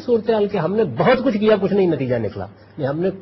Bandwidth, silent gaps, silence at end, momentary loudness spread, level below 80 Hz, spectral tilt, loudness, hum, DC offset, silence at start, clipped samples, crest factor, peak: 6 kHz; none; 0 s; 11 LU; -52 dBFS; -9 dB/octave; -19 LUFS; none; under 0.1%; 0 s; under 0.1%; 14 dB; -4 dBFS